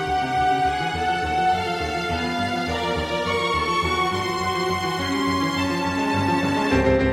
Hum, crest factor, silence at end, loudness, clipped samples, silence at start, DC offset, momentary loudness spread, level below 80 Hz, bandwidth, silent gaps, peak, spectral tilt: none; 14 dB; 0 s; -22 LUFS; under 0.1%; 0 s; under 0.1%; 4 LU; -38 dBFS; 16 kHz; none; -8 dBFS; -5 dB/octave